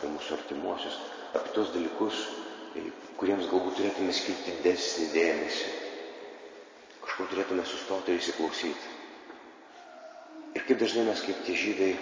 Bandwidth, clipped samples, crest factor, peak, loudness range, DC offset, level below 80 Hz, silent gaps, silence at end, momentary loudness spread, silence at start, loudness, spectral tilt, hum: 7.8 kHz; under 0.1%; 20 dB; -12 dBFS; 4 LU; under 0.1%; -68 dBFS; none; 0 s; 20 LU; 0 s; -31 LUFS; -3 dB/octave; none